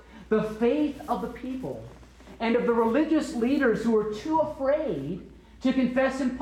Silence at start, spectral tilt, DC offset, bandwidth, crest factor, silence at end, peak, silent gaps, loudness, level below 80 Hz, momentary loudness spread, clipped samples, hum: 0.1 s; -6.5 dB/octave; under 0.1%; 14 kHz; 14 dB; 0 s; -12 dBFS; none; -26 LUFS; -52 dBFS; 11 LU; under 0.1%; none